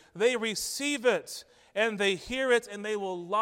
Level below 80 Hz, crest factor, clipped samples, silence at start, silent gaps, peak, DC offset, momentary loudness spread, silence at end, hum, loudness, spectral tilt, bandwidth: -62 dBFS; 18 dB; under 0.1%; 0.15 s; none; -12 dBFS; under 0.1%; 8 LU; 0 s; none; -29 LUFS; -2.5 dB/octave; 16 kHz